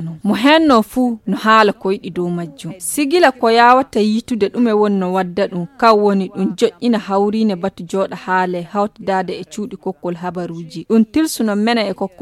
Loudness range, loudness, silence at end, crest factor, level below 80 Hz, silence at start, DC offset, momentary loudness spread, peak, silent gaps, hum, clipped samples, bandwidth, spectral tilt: 5 LU; -16 LUFS; 0.15 s; 16 dB; -54 dBFS; 0 s; under 0.1%; 13 LU; 0 dBFS; none; none; under 0.1%; 15 kHz; -5 dB/octave